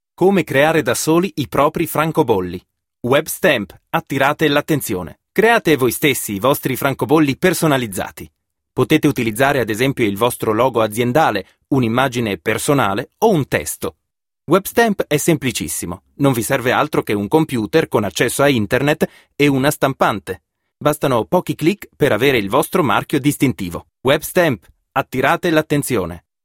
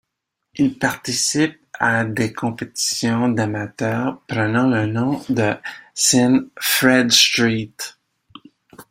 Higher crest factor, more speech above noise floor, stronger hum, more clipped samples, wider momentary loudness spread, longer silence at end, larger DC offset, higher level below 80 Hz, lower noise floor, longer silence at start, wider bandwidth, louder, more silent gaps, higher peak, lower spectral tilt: about the same, 16 dB vs 20 dB; second, 25 dB vs 60 dB; neither; neither; second, 8 LU vs 12 LU; first, 0.25 s vs 0.1 s; neither; first, -48 dBFS vs -56 dBFS; second, -42 dBFS vs -78 dBFS; second, 0.2 s vs 0.55 s; about the same, 16.5 kHz vs 16.5 kHz; about the same, -17 LUFS vs -18 LUFS; neither; about the same, 0 dBFS vs 0 dBFS; first, -5 dB/octave vs -3.5 dB/octave